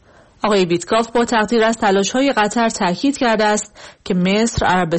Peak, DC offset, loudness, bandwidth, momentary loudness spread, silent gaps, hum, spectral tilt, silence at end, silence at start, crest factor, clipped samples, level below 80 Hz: -6 dBFS; 0.3%; -16 LUFS; 8.8 kHz; 6 LU; none; none; -4.5 dB/octave; 0 s; 0.45 s; 10 dB; under 0.1%; -42 dBFS